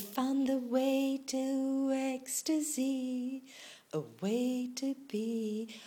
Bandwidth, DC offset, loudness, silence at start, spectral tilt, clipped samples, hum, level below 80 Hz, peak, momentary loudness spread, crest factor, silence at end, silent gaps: 18.5 kHz; under 0.1%; -34 LUFS; 0 s; -4 dB/octave; under 0.1%; none; -84 dBFS; -20 dBFS; 10 LU; 14 dB; 0 s; none